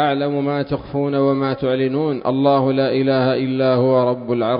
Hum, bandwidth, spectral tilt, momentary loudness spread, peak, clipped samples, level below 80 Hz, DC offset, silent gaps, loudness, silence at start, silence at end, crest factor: none; 5.2 kHz; -12 dB/octave; 5 LU; -4 dBFS; under 0.1%; -52 dBFS; under 0.1%; none; -18 LUFS; 0 s; 0 s; 14 dB